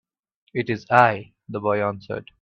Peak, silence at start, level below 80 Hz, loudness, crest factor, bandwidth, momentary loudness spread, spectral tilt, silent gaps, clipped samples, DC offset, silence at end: 0 dBFS; 0.55 s; -62 dBFS; -22 LUFS; 22 dB; 8.4 kHz; 16 LU; -7.5 dB/octave; none; under 0.1%; under 0.1%; 0.2 s